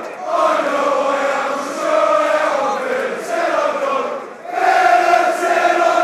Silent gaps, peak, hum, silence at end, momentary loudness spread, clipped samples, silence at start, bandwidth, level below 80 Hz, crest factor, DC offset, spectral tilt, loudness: none; -2 dBFS; none; 0 s; 8 LU; under 0.1%; 0 s; 14 kHz; -72 dBFS; 14 dB; under 0.1%; -2.5 dB/octave; -16 LUFS